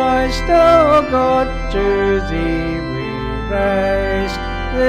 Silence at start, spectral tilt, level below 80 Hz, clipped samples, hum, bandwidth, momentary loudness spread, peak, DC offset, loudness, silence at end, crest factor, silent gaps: 0 s; -6 dB/octave; -26 dBFS; under 0.1%; none; 13.5 kHz; 11 LU; 0 dBFS; under 0.1%; -16 LUFS; 0 s; 14 dB; none